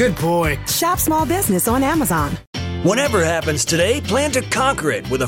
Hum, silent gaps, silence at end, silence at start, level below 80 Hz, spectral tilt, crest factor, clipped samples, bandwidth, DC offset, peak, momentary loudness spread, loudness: none; 2.47-2.53 s; 0 s; 0 s; -36 dBFS; -4 dB/octave; 14 dB; under 0.1%; 17 kHz; under 0.1%; -4 dBFS; 4 LU; -18 LUFS